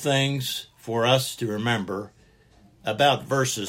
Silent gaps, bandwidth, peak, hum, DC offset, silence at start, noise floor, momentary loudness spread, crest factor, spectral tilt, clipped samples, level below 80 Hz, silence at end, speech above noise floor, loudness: none; 16.5 kHz; -6 dBFS; none; under 0.1%; 0 s; -56 dBFS; 12 LU; 18 dB; -4 dB/octave; under 0.1%; -62 dBFS; 0 s; 32 dB; -24 LUFS